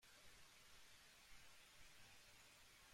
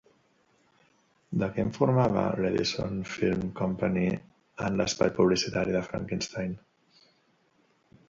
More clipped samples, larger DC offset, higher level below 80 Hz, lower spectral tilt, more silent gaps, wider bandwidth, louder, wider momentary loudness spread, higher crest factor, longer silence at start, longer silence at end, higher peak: neither; neither; second, -78 dBFS vs -54 dBFS; second, -1 dB/octave vs -5.5 dB/octave; neither; first, 16 kHz vs 7.6 kHz; second, -66 LUFS vs -28 LUFS; second, 1 LU vs 10 LU; second, 14 dB vs 20 dB; second, 0 s vs 1.3 s; second, 0 s vs 1.5 s; second, -52 dBFS vs -10 dBFS